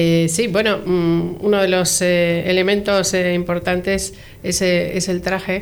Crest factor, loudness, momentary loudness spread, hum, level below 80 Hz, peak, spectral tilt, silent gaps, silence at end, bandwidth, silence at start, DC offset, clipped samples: 12 dB; -17 LUFS; 6 LU; none; -42 dBFS; -6 dBFS; -4 dB/octave; none; 0 s; over 20 kHz; 0 s; under 0.1%; under 0.1%